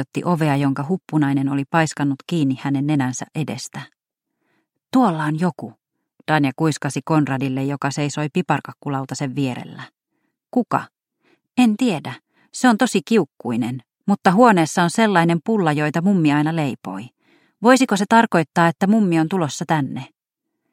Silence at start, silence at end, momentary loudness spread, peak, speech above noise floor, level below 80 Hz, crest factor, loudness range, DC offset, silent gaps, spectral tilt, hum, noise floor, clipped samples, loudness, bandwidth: 0 s; 0.65 s; 13 LU; 0 dBFS; 61 dB; -66 dBFS; 20 dB; 7 LU; under 0.1%; none; -6 dB/octave; none; -79 dBFS; under 0.1%; -19 LUFS; 15.5 kHz